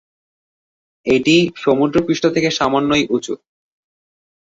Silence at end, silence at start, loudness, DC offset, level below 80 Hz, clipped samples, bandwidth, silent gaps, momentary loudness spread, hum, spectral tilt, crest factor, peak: 1.25 s; 1.05 s; -16 LUFS; under 0.1%; -50 dBFS; under 0.1%; 8 kHz; none; 11 LU; none; -5 dB/octave; 16 dB; -2 dBFS